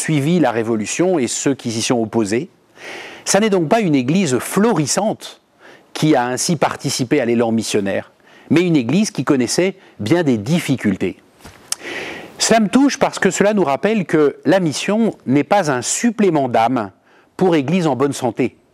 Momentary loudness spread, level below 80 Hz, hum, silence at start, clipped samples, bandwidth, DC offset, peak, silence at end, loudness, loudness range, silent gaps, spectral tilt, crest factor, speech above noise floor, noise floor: 10 LU; -60 dBFS; none; 0 s; under 0.1%; 15.5 kHz; under 0.1%; 0 dBFS; 0.25 s; -17 LUFS; 3 LU; none; -5 dB/octave; 16 dB; 30 dB; -46 dBFS